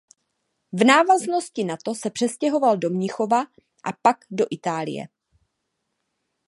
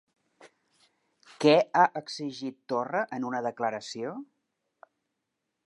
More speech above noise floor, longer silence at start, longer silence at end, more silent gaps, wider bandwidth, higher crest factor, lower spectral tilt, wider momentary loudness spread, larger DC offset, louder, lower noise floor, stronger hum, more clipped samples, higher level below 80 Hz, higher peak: about the same, 56 dB vs 55 dB; first, 0.75 s vs 0.45 s; about the same, 1.4 s vs 1.4 s; neither; about the same, 11.5 kHz vs 11 kHz; about the same, 22 dB vs 22 dB; about the same, -4.5 dB/octave vs -5 dB/octave; about the same, 17 LU vs 15 LU; neither; first, -22 LUFS vs -28 LUFS; second, -77 dBFS vs -83 dBFS; neither; neither; first, -72 dBFS vs -86 dBFS; first, -2 dBFS vs -8 dBFS